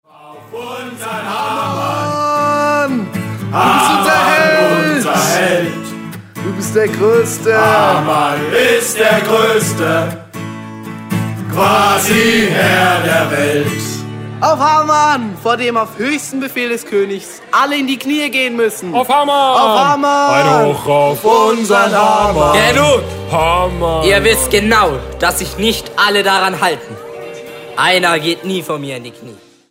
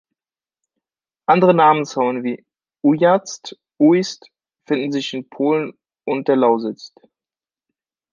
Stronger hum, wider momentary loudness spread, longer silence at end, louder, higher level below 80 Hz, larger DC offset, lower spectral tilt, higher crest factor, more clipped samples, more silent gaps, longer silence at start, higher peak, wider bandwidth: neither; second, 14 LU vs 18 LU; second, 0.35 s vs 1.25 s; first, -12 LUFS vs -18 LUFS; first, -36 dBFS vs -70 dBFS; neither; second, -4 dB/octave vs -6 dB/octave; about the same, 14 dB vs 18 dB; neither; neither; second, 0.25 s vs 1.3 s; about the same, 0 dBFS vs -2 dBFS; first, 16.5 kHz vs 7.4 kHz